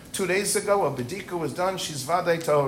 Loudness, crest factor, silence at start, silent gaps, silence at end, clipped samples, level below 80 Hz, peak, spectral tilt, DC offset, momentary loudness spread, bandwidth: -25 LUFS; 16 dB; 0 s; none; 0 s; under 0.1%; -58 dBFS; -10 dBFS; -3.5 dB/octave; under 0.1%; 8 LU; 16 kHz